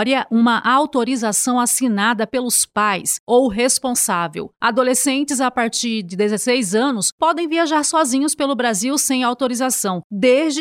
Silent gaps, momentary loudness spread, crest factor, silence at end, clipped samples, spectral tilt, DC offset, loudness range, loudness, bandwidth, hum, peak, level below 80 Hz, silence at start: 3.20-3.27 s, 7.12-7.18 s, 10.04-10.10 s; 5 LU; 14 dB; 0 s; under 0.1%; -2.5 dB/octave; under 0.1%; 1 LU; -17 LUFS; 16.5 kHz; none; -4 dBFS; -58 dBFS; 0 s